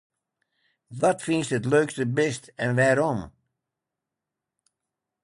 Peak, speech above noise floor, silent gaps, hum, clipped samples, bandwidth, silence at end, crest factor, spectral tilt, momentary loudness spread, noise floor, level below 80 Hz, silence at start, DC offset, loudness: -10 dBFS; 63 dB; none; none; under 0.1%; 11.5 kHz; 1.95 s; 18 dB; -5.5 dB/octave; 10 LU; -86 dBFS; -60 dBFS; 0.9 s; under 0.1%; -24 LUFS